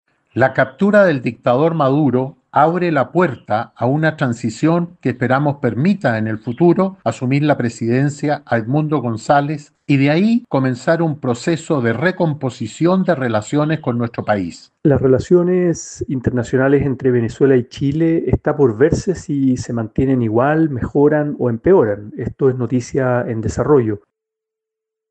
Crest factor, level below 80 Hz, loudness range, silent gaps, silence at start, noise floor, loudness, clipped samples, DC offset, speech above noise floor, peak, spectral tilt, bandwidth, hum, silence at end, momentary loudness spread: 16 dB; -42 dBFS; 2 LU; none; 0.35 s; -83 dBFS; -17 LUFS; under 0.1%; under 0.1%; 67 dB; 0 dBFS; -7.5 dB/octave; 9 kHz; none; 1.15 s; 7 LU